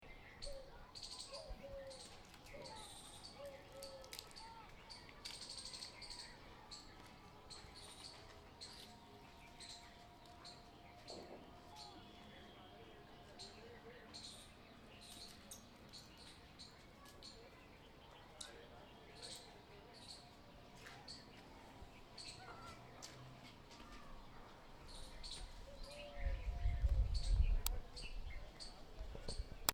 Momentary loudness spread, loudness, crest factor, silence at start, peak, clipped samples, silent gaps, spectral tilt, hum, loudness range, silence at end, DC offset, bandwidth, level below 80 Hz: 13 LU; -52 LUFS; 38 dB; 0 s; -12 dBFS; under 0.1%; none; -3.5 dB/octave; none; 13 LU; 0 s; under 0.1%; 19.5 kHz; -50 dBFS